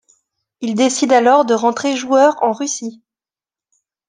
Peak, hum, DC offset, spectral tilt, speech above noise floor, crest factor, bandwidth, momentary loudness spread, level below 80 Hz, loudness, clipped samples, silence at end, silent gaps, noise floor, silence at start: -2 dBFS; none; under 0.1%; -3 dB/octave; over 76 dB; 16 dB; 10.5 kHz; 12 LU; -68 dBFS; -15 LUFS; under 0.1%; 1.15 s; none; under -90 dBFS; 0.6 s